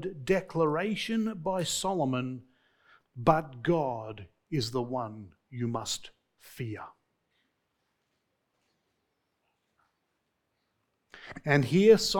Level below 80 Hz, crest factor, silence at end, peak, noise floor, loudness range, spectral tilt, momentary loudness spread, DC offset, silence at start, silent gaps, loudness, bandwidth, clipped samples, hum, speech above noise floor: -60 dBFS; 24 dB; 0 s; -8 dBFS; -79 dBFS; 17 LU; -5 dB/octave; 18 LU; under 0.1%; 0 s; none; -29 LUFS; 19 kHz; under 0.1%; none; 51 dB